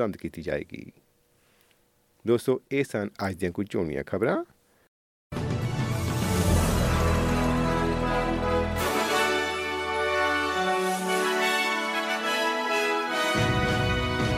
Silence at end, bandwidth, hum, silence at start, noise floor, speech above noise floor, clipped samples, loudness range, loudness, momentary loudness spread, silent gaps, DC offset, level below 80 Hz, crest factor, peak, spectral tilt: 0 s; 16.5 kHz; none; 0 s; -66 dBFS; 37 dB; under 0.1%; 6 LU; -26 LUFS; 8 LU; 4.88-5.30 s; under 0.1%; -40 dBFS; 16 dB; -12 dBFS; -5 dB/octave